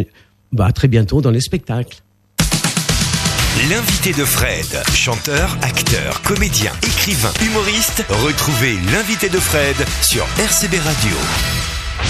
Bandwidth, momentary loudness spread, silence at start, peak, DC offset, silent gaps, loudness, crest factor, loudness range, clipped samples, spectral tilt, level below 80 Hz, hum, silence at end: 15 kHz; 4 LU; 0 s; 0 dBFS; under 0.1%; none; -15 LUFS; 16 dB; 1 LU; under 0.1%; -3.5 dB/octave; -28 dBFS; none; 0 s